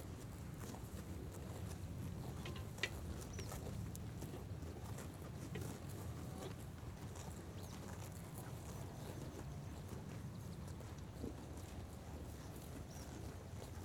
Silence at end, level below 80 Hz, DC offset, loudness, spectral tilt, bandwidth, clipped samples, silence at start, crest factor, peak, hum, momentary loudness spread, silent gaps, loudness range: 0 s; -58 dBFS; under 0.1%; -50 LUFS; -5.5 dB/octave; 19 kHz; under 0.1%; 0 s; 26 dB; -24 dBFS; none; 4 LU; none; 3 LU